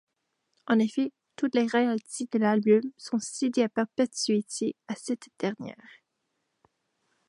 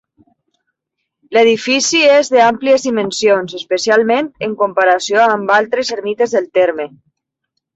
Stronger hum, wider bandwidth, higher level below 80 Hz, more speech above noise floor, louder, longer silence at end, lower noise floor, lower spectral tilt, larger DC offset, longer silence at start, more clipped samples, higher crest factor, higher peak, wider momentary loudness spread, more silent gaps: neither; first, 11.5 kHz vs 8.2 kHz; second, -80 dBFS vs -62 dBFS; second, 52 dB vs 62 dB; second, -28 LUFS vs -13 LUFS; first, 1.55 s vs 0.9 s; first, -79 dBFS vs -75 dBFS; first, -4.5 dB/octave vs -2.5 dB/octave; neither; second, 0.7 s vs 1.3 s; neither; about the same, 18 dB vs 14 dB; second, -12 dBFS vs -2 dBFS; about the same, 9 LU vs 8 LU; neither